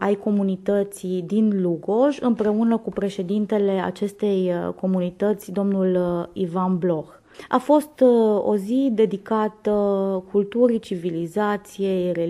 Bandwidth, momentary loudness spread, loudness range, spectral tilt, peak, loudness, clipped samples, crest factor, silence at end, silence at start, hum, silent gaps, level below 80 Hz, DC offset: 13 kHz; 7 LU; 3 LU; -7.5 dB/octave; -6 dBFS; -22 LUFS; under 0.1%; 16 dB; 0 s; 0 s; none; none; -60 dBFS; under 0.1%